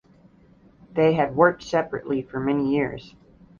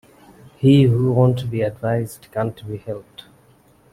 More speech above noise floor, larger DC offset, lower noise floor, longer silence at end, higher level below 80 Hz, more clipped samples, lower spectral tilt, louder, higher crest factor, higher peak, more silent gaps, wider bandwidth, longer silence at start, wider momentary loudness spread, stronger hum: about the same, 32 dB vs 35 dB; neither; about the same, -54 dBFS vs -53 dBFS; second, 0.5 s vs 0.9 s; about the same, -56 dBFS vs -52 dBFS; neither; second, -7 dB/octave vs -8.5 dB/octave; second, -23 LUFS vs -19 LUFS; about the same, 20 dB vs 16 dB; about the same, -4 dBFS vs -2 dBFS; neither; second, 7.2 kHz vs 14 kHz; first, 0.9 s vs 0.6 s; second, 10 LU vs 17 LU; neither